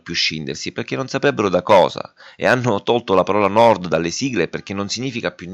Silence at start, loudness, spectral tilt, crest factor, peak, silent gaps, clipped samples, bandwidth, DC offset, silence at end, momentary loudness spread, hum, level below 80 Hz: 0.05 s; -18 LUFS; -4.5 dB/octave; 16 dB; -2 dBFS; none; under 0.1%; 10 kHz; under 0.1%; 0 s; 12 LU; none; -56 dBFS